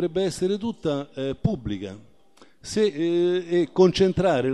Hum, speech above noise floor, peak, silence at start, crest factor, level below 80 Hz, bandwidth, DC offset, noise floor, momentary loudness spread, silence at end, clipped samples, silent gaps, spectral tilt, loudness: none; 33 dB; -6 dBFS; 0 s; 18 dB; -48 dBFS; 12 kHz; 0.2%; -56 dBFS; 12 LU; 0 s; under 0.1%; none; -6 dB/octave; -24 LUFS